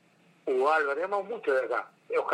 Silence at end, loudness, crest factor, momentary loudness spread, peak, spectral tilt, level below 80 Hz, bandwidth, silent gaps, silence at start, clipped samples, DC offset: 0 s; -29 LUFS; 16 dB; 8 LU; -12 dBFS; -4.5 dB/octave; under -90 dBFS; 11 kHz; none; 0.45 s; under 0.1%; under 0.1%